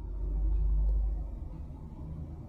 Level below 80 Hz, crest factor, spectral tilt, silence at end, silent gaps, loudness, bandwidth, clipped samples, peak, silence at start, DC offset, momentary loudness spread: -32 dBFS; 10 dB; -11 dB/octave; 0 s; none; -36 LUFS; 1.4 kHz; under 0.1%; -22 dBFS; 0 s; under 0.1%; 13 LU